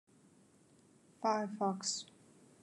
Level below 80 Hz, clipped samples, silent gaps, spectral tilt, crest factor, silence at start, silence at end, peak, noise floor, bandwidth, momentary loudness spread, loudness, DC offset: under -90 dBFS; under 0.1%; none; -3.5 dB/octave; 22 dB; 1.2 s; 0.55 s; -20 dBFS; -67 dBFS; 11.5 kHz; 7 LU; -37 LUFS; under 0.1%